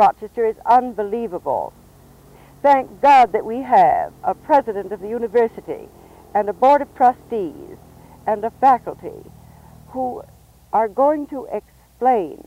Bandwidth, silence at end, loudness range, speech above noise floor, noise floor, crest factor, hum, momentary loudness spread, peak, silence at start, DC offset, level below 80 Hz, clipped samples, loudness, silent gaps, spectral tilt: 16 kHz; 0.1 s; 6 LU; 29 dB; -47 dBFS; 14 dB; none; 16 LU; -6 dBFS; 0 s; under 0.1%; -52 dBFS; under 0.1%; -18 LUFS; none; -6 dB/octave